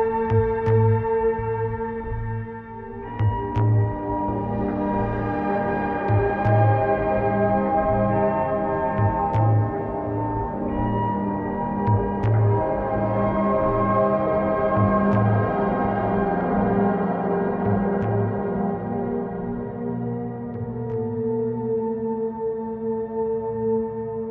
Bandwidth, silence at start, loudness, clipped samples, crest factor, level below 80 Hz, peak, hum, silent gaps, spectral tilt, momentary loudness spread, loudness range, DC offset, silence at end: 3.8 kHz; 0 s; -23 LUFS; under 0.1%; 16 dB; -40 dBFS; -8 dBFS; none; none; -11.5 dB/octave; 9 LU; 6 LU; under 0.1%; 0 s